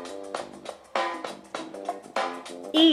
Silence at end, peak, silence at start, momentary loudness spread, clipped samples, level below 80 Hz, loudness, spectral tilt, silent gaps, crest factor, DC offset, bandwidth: 0 s; -8 dBFS; 0 s; 10 LU; under 0.1%; -72 dBFS; -31 LUFS; -2.5 dB/octave; none; 20 dB; under 0.1%; 13 kHz